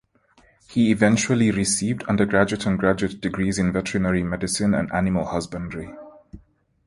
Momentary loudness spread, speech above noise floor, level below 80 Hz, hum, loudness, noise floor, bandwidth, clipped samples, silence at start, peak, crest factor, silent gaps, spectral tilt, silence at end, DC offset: 10 LU; 37 dB; -44 dBFS; none; -22 LUFS; -58 dBFS; 11.5 kHz; under 0.1%; 0.7 s; -2 dBFS; 20 dB; none; -5 dB/octave; 0.5 s; under 0.1%